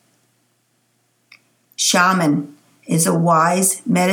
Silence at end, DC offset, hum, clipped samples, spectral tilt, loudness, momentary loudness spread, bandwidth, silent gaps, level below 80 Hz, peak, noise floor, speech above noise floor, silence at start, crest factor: 0 s; under 0.1%; none; under 0.1%; -4 dB/octave; -16 LUFS; 9 LU; 19 kHz; none; -72 dBFS; 0 dBFS; -64 dBFS; 48 dB; 1.8 s; 18 dB